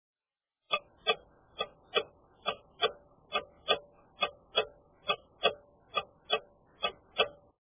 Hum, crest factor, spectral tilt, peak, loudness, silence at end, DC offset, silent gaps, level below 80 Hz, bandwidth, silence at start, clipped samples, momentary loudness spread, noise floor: none; 24 dB; 1.5 dB/octave; -14 dBFS; -34 LUFS; 0.3 s; under 0.1%; none; -68 dBFS; 3.9 kHz; 0.7 s; under 0.1%; 8 LU; under -90 dBFS